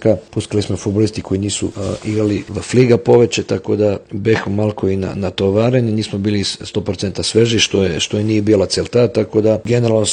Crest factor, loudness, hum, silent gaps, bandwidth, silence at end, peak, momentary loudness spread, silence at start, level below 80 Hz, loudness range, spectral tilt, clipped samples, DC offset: 16 dB; -16 LUFS; none; none; 10 kHz; 0 s; 0 dBFS; 8 LU; 0 s; -46 dBFS; 2 LU; -5.5 dB/octave; under 0.1%; under 0.1%